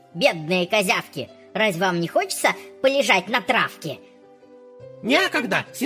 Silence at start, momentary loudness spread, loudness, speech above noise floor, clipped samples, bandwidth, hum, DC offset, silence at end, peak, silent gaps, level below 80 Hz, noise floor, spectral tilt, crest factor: 0.15 s; 14 LU; -21 LUFS; 27 dB; under 0.1%; 16 kHz; none; under 0.1%; 0 s; -4 dBFS; none; -70 dBFS; -49 dBFS; -3.5 dB/octave; 18 dB